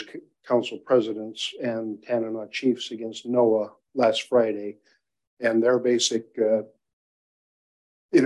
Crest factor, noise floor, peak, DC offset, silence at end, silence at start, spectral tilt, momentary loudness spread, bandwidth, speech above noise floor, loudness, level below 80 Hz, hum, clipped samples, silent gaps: 18 dB; under -90 dBFS; -8 dBFS; under 0.1%; 0 s; 0 s; -4 dB/octave; 11 LU; 11.5 kHz; over 66 dB; -25 LUFS; -76 dBFS; none; under 0.1%; 5.27-5.37 s, 6.93-8.09 s